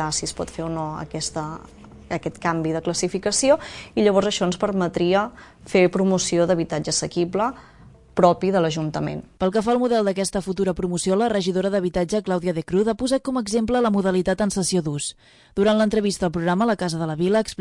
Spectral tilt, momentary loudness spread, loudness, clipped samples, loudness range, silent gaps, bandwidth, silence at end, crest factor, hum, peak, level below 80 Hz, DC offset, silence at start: -5 dB/octave; 10 LU; -22 LUFS; under 0.1%; 2 LU; none; 11.5 kHz; 0.05 s; 20 dB; none; -2 dBFS; -48 dBFS; under 0.1%; 0 s